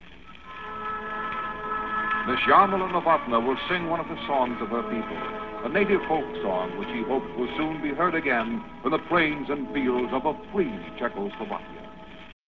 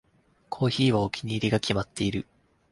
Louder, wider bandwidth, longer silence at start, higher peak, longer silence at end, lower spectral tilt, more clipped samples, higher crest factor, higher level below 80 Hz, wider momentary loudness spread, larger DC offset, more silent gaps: about the same, -26 LUFS vs -27 LUFS; second, 6.8 kHz vs 11.5 kHz; second, 0 s vs 0.5 s; first, -6 dBFS vs -10 dBFS; second, 0 s vs 0.5 s; first, -7.5 dB/octave vs -6 dB/octave; neither; about the same, 20 dB vs 18 dB; about the same, -52 dBFS vs -52 dBFS; about the same, 11 LU vs 12 LU; first, 0.4% vs under 0.1%; neither